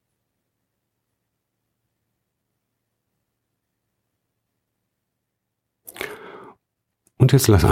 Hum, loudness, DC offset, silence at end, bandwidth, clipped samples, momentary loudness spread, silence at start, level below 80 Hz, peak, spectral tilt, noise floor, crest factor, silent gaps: none; -16 LUFS; under 0.1%; 0 s; 16 kHz; under 0.1%; 19 LU; 6 s; -42 dBFS; -2 dBFS; -6 dB/octave; -79 dBFS; 24 dB; none